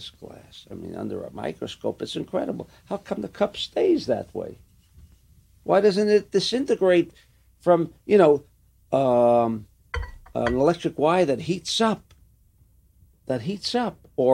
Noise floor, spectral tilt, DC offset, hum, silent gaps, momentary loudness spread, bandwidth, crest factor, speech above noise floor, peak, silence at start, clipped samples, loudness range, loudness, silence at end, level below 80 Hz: -58 dBFS; -5.5 dB/octave; under 0.1%; none; none; 16 LU; 13.5 kHz; 20 dB; 35 dB; -4 dBFS; 0 s; under 0.1%; 7 LU; -23 LUFS; 0 s; -48 dBFS